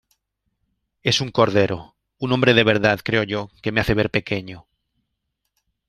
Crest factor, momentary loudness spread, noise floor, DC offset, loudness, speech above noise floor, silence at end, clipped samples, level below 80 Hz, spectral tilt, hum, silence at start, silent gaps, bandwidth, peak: 20 dB; 12 LU; -77 dBFS; under 0.1%; -20 LUFS; 57 dB; 1.3 s; under 0.1%; -46 dBFS; -5 dB/octave; none; 1.05 s; none; 15 kHz; -2 dBFS